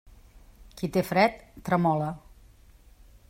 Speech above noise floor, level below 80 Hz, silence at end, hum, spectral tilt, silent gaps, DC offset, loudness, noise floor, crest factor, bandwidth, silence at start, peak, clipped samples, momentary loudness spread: 29 dB; -54 dBFS; 1.1 s; none; -6.5 dB/octave; none; under 0.1%; -26 LUFS; -54 dBFS; 22 dB; 16 kHz; 0.75 s; -8 dBFS; under 0.1%; 14 LU